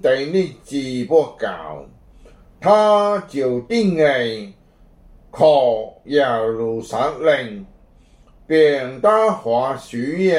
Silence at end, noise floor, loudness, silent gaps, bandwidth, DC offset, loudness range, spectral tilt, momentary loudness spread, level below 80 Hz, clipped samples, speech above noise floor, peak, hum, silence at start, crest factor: 0 s; -50 dBFS; -18 LUFS; none; 11.5 kHz; under 0.1%; 1 LU; -6 dB/octave; 12 LU; -52 dBFS; under 0.1%; 32 dB; -2 dBFS; none; 0.05 s; 18 dB